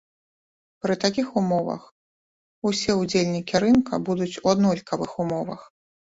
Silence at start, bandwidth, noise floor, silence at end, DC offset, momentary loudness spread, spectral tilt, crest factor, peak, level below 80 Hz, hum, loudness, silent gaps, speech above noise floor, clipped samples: 0.85 s; 8 kHz; under -90 dBFS; 0.5 s; under 0.1%; 11 LU; -5.5 dB/octave; 18 dB; -6 dBFS; -58 dBFS; none; -24 LUFS; 1.92-2.62 s; over 67 dB; under 0.1%